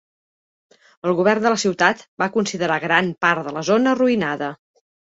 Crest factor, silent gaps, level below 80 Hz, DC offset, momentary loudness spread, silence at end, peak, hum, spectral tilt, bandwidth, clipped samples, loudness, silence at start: 18 dB; 2.08-2.17 s; -64 dBFS; under 0.1%; 7 LU; 0.55 s; -2 dBFS; none; -4.5 dB/octave; 8 kHz; under 0.1%; -19 LUFS; 1.05 s